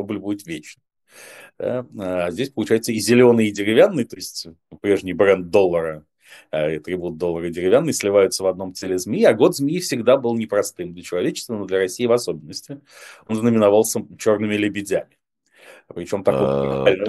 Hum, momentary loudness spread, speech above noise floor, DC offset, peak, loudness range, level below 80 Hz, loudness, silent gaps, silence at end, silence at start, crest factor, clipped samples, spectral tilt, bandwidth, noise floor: none; 14 LU; 34 dB; under 0.1%; 0 dBFS; 4 LU; -56 dBFS; -20 LUFS; none; 0 s; 0 s; 20 dB; under 0.1%; -5 dB/octave; 12.5 kHz; -54 dBFS